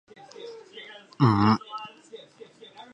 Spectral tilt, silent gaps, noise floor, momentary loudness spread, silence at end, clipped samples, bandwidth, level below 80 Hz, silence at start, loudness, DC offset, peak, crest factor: -8 dB/octave; none; -50 dBFS; 26 LU; 0.75 s; under 0.1%; 8.6 kHz; -56 dBFS; 0.4 s; -23 LUFS; under 0.1%; -8 dBFS; 20 dB